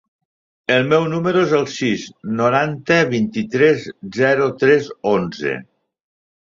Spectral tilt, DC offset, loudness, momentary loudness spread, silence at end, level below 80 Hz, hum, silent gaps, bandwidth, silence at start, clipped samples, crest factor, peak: -6 dB/octave; under 0.1%; -17 LUFS; 9 LU; 0.85 s; -58 dBFS; none; none; 7.6 kHz; 0.7 s; under 0.1%; 18 dB; -2 dBFS